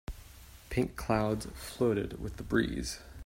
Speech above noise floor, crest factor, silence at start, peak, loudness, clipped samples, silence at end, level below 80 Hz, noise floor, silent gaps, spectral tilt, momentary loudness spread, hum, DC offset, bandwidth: 20 dB; 20 dB; 0.1 s; -14 dBFS; -33 LUFS; under 0.1%; 0 s; -46 dBFS; -52 dBFS; none; -5.5 dB/octave; 17 LU; none; under 0.1%; 16 kHz